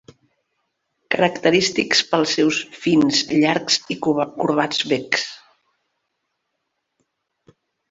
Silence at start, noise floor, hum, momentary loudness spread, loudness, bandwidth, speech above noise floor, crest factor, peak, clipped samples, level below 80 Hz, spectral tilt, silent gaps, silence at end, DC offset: 1.1 s; -76 dBFS; none; 5 LU; -19 LUFS; 8 kHz; 57 dB; 20 dB; -2 dBFS; under 0.1%; -62 dBFS; -3.5 dB/octave; none; 2.55 s; under 0.1%